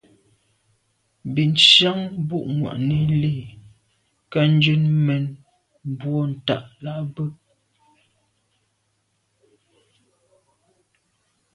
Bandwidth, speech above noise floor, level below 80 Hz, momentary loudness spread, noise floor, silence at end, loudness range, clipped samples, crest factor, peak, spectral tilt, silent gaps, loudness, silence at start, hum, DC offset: 9.6 kHz; 50 dB; -56 dBFS; 18 LU; -70 dBFS; 4.2 s; 15 LU; under 0.1%; 24 dB; 0 dBFS; -5.5 dB/octave; none; -19 LUFS; 1.25 s; none; under 0.1%